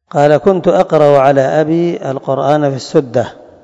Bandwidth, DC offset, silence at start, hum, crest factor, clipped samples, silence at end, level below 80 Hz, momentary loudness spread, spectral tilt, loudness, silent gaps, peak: 8 kHz; under 0.1%; 0.15 s; none; 12 dB; 0.9%; 0.3 s; -50 dBFS; 9 LU; -7 dB/octave; -12 LUFS; none; 0 dBFS